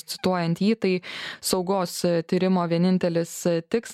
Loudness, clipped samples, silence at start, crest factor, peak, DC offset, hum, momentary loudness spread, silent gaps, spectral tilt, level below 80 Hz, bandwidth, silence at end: -24 LUFS; under 0.1%; 0.1 s; 16 dB; -8 dBFS; under 0.1%; none; 4 LU; none; -5.5 dB/octave; -62 dBFS; 15.5 kHz; 0 s